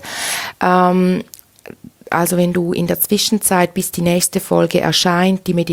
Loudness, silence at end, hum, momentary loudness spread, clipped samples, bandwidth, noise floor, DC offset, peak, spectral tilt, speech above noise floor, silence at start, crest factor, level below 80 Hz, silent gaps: -15 LUFS; 0 s; none; 7 LU; under 0.1%; 18 kHz; -39 dBFS; under 0.1%; 0 dBFS; -4.5 dB/octave; 24 dB; 0 s; 16 dB; -50 dBFS; none